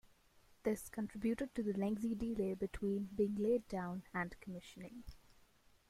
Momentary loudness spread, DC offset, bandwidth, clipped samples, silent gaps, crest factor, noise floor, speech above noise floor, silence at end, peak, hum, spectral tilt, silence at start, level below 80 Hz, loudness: 14 LU; under 0.1%; 15.5 kHz; under 0.1%; none; 16 dB; -69 dBFS; 29 dB; 0.7 s; -24 dBFS; none; -7 dB/octave; 0.65 s; -62 dBFS; -40 LUFS